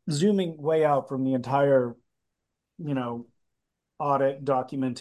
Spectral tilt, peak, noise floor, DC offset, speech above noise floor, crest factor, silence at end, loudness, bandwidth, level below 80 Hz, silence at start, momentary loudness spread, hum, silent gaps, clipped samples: -7 dB/octave; -10 dBFS; -82 dBFS; under 0.1%; 57 dB; 16 dB; 0 s; -26 LUFS; 12 kHz; -72 dBFS; 0.05 s; 11 LU; none; none; under 0.1%